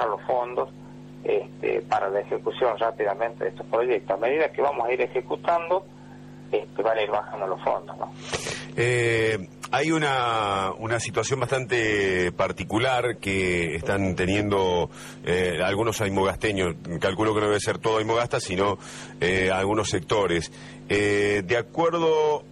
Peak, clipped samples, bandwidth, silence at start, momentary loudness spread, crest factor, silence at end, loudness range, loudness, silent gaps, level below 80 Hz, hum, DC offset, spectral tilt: -12 dBFS; under 0.1%; 13 kHz; 0 s; 8 LU; 14 dB; 0 s; 3 LU; -25 LUFS; none; -52 dBFS; 50 Hz at -50 dBFS; under 0.1%; -5 dB/octave